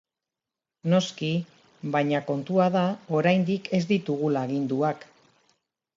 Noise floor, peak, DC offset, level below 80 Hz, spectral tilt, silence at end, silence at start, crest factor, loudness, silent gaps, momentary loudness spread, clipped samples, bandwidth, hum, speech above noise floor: -89 dBFS; -8 dBFS; under 0.1%; -72 dBFS; -7 dB/octave; 0.9 s; 0.85 s; 18 dB; -26 LUFS; none; 8 LU; under 0.1%; 7.6 kHz; none; 64 dB